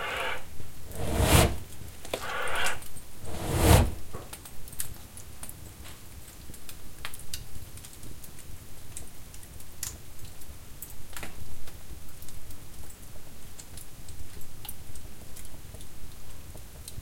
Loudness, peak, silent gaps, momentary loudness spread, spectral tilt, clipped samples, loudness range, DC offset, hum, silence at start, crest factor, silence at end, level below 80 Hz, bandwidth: -31 LUFS; -6 dBFS; none; 20 LU; -4 dB/octave; under 0.1%; 17 LU; under 0.1%; none; 0 s; 24 dB; 0 s; -40 dBFS; 17 kHz